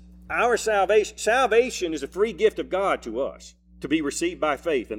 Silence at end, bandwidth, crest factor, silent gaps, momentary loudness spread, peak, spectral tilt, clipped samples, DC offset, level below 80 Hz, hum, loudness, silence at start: 0 s; 15.5 kHz; 16 dB; none; 9 LU; -8 dBFS; -3.5 dB/octave; under 0.1%; under 0.1%; -50 dBFS; none; -24 LUFS; 0.1 s